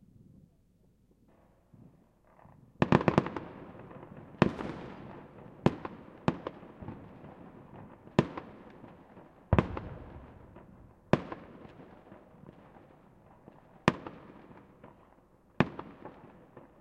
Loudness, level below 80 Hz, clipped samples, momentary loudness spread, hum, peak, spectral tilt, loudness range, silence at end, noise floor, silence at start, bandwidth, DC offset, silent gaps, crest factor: -33 LUFS; -54 dBFS; under 0.1%; 25 LU; none; -2 dBFS; -7.5 dB/octave; 7 LU; 0.2 s; -66 dBFS; 2.8 s; 10 kHz; under 0.1%; none; 34 dB